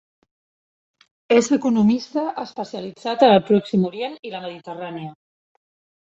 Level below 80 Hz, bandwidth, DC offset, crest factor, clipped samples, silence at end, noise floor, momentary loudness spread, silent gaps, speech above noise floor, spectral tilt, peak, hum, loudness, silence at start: -64 dBFS; 8 kHz; under 0.1%; 20 dB; under 0.1%; 0.9 s; under -90 dBFS; 17 LU; none; over 70 dB; -6 dB/octave; -2 dBFS; none; -19 LUFS; 1.3 s